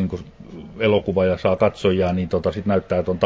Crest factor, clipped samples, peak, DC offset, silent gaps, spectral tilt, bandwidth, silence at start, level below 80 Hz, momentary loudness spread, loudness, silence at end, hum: 18 dB; under 0.1%; -4 dBFS; under 0.1%; none; -8 dB/octave; 7.8 kHz; 0 s; -40 dBFS; 16 LU; -20 LUFS; 0 s; none